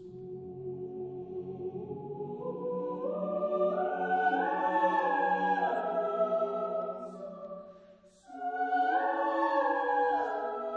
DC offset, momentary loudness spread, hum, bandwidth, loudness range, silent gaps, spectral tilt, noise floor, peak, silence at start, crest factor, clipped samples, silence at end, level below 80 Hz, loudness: under 0.1%; 14 LU; none; 7.6 kHz; 6 LU; none; -7.5 dB/octave; -58 dBFS; -16 dBFS; 0 s; 16 dB; under 0.1%; 0 s; -76 dBFS; -32 LUFS